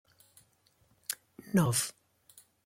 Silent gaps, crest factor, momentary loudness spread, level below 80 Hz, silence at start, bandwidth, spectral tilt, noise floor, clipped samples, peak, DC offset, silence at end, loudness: none; 26 dB; 14 LU; -68 dBFS; 1.1 s; 16.5 kHz; -4.5 dB/octave; -69 dBFS; under 0.1%; -10 dBFS; under 0.1%; 0.75 s; -32 LUFS